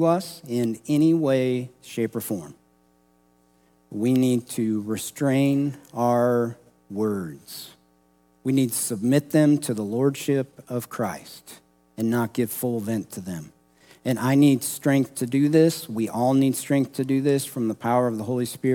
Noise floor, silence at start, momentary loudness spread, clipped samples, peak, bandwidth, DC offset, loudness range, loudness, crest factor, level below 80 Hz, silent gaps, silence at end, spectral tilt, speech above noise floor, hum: -62 dBFS; 0 s; 13 LU; under 0.1%; -6 dBFS; 18 kHz; under 0.1%; 6 LU; -24 LUFS; 18 dB; -70 dBFS; none; 0 s; -6 dB/octave; 39 dB; none